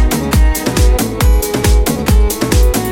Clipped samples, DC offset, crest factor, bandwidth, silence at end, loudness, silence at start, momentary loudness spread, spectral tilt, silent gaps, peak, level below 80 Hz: under 0.1%; under 0.1%; 10 dB; 18 kHz; 0 s; -13 LUFS; 0 s; 1 LU; -5 dB/octave; none; 0 dBFS; -12 dBFS